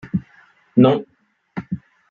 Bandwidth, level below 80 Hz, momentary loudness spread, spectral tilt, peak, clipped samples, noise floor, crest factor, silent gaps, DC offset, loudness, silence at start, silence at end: 4.4 kHz; -56 dBFS; 18 LU; -10 dB/octave; -2 dBFS; under 0.1%; -53 dBFS; 18 dB; none; under 0.1%; -19 LUFS; 0.05 s; 0.35 s